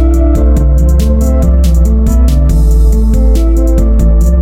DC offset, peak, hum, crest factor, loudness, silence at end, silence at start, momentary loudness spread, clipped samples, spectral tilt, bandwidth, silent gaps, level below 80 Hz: under 0.1%; 0 dBFS; none; 6 dB; -10 LUFS; 0 s; 0 s; 1 LU; under 0.1%; -8 dB/octave; 14.5 kHz; none; -6 dBFS